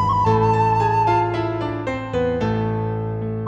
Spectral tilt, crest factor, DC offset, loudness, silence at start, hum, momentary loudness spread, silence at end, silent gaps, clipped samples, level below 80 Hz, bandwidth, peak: -8 dB/octave; 14 dB; under 0.1%; -20 LUFS; 0 s; none; 8 LU; 0 s; none; under 0.1%; -40 dBFS; 8 kHz; -6 dBFS